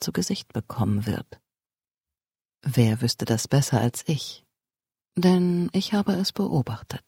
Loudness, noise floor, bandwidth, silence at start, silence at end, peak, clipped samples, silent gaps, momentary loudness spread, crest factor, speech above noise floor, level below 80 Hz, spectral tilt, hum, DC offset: -25 LUFS; under -90 dBFS; 16.5 kHz; 0 s; 0.1 s; -6 dBFS; under 0.1%; 1.91-1.95 s, 2.45-2.49 s; 11 LU; 20 dB; over 66 dB; -56 dBFS; -5.5 dB/octave; none; under 0.1%